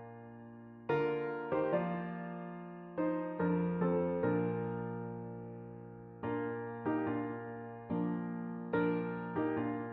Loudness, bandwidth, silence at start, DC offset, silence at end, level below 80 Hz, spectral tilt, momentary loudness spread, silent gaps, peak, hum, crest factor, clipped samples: -37 LUFS; 4.5 kHz; 0 s; under 0.1%; 0 s; -70 dBFS; -8 dB/octave; 14 LU; none; -20 dBFS; none; 16 dB; under 0.1%